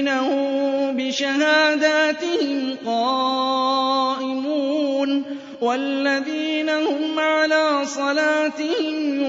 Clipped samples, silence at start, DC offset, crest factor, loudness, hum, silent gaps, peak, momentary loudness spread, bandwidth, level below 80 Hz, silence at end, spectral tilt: under 0.1%; 0 s; under 0.1%; 16 dB; -20 LUFS; none; none; -4 dBFS; 6 LU; 7.8 kHz; -76 dBFS; 0 s; -2 dB/octave